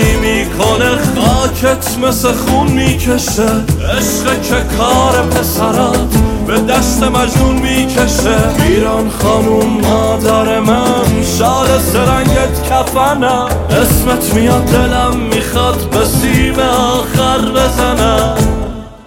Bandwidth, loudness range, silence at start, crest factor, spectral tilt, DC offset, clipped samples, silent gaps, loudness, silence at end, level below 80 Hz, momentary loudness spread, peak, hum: 17 kHz; 1 LU; 0 s; 10 dB; -5 dB/octave; under 0.1%; under 0.1%; none; -11 LUFS; 0.1 s; -20 dBFS; 3 LU; 0 dBFS; none